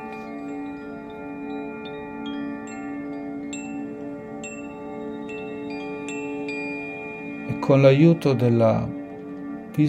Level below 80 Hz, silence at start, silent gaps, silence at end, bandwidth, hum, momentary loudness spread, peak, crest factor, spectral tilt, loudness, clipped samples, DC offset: -58 dBFS; 0 s; none; 0 s; 14 kHz; none; 17 LU; -2 dBFS; 22 dB; -7.5 dB/octave; -25 LUFS; under 0.1%; under 0.1%